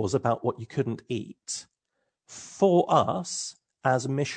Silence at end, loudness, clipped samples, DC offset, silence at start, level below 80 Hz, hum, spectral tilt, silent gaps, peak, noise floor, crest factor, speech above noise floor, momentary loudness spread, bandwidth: 0 s; -27 LUFS; under 0.1%; under 0.1%; 0 s; -68 dBFS; none; -5 dB/octave; none; -8 dBFS; -80 dBFS; 20 dB; 53 dB; 15 LU; 9.4 kHz